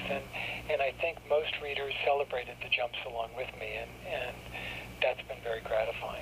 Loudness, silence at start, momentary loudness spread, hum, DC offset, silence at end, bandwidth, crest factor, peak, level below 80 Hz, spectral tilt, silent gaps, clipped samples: -34 LUFS; 0 s; 8 LU; 60 Hz at -55 dBFS; under 0.1%; 0 s; 15.5 kHz; 20 dB; -14 dBFS; -54 dBFS; -4 dB/octave; none; under 0.1%